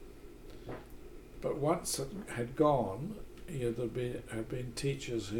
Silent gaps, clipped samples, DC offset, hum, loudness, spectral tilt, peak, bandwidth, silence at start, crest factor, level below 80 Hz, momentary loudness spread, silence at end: none; under 0.1%; under 0.1%; none; -36 LUFS; -5.5 dB/octave; -16 dBFS; 19 kHz; 0 s; 20 dB; -52 dBFS; 23 LU; 0 s